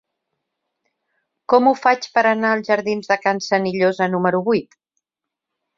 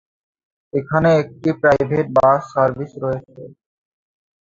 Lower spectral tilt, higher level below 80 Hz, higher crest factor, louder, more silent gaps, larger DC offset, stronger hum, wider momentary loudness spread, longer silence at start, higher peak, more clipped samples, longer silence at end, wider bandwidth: second, -5.5 dB/octave vs -8 dB/octave; second, -66 dBFS vs -50 dBFS; about the same, 18 dB vs 18 dB; about the same, -18 LUFS vs -18 LUFS; neither; neither; neither; second, 5 LU vs 11 LU; first, 1.5 s vs 0.75 s; about the same, -2 dBFS vs -2 dBFS; neither; about the same, 1.15 s vs 1.05 s; about the same, 7.6 kHz vs 7.6 kHz